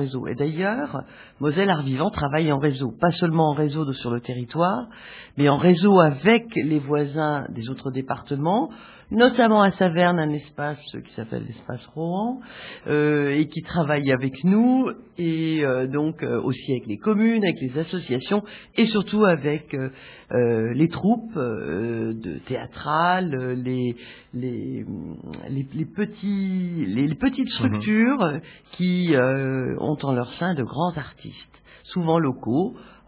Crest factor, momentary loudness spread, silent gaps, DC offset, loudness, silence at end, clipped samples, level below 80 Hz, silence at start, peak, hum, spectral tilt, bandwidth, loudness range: 20 dB; 13 LU; none; under 0.1%; -23 LUFS; 0.2 s; under 0.1%; -54 dBFS; 0 s; -2 dBFS; none; -11 dB/octave; 4 kHz; 6 LU